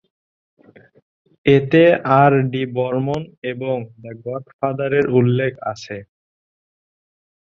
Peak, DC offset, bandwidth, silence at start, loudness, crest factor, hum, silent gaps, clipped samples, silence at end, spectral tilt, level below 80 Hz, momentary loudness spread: -2 dBFS; under 0.1%; 7.2 kHz; 1.45 s; -18 LUFS; 18 dB; none; 3.38-3.42 s, 4.53-4.59 s; under 0.1%; 1.45 s; -8 dB/octave; -58 dBFS; 17 LU